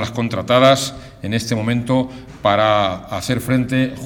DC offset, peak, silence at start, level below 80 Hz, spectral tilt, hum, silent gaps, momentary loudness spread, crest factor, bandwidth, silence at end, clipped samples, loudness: under 0.1%; 0 dBFS; 0 s; -44 dBFS; -5.5 dB/octave; none; none; 11 LU; 18 dB; 18 kHz; 0 s; under 0.1%; -17 LUFS